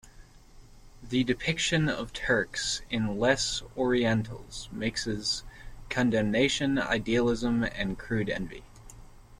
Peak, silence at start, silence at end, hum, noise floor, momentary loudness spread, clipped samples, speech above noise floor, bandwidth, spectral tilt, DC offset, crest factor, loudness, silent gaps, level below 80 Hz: -10 dBFS; 0.05 s; 0.05 s; none; -52 dBFS; 8 LU; under 0.1%; 24 dB; 13.5 kHz; -4.5 dB/octave; under 0.1%; 20 dB; -28 LUFS; none; -48 dBFS